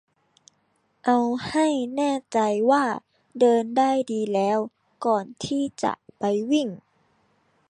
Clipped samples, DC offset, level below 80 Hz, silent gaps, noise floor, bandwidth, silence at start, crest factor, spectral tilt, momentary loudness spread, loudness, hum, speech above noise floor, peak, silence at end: under 0.1%; under 0.1%; -66 dBFS; none; -68 dBFS; 11 kHz; 1.05 s; 18 dB; -5 dB/octave; 9 LU; -24 LUFS; none; 46 dB; -8 dBFS; 0.9 s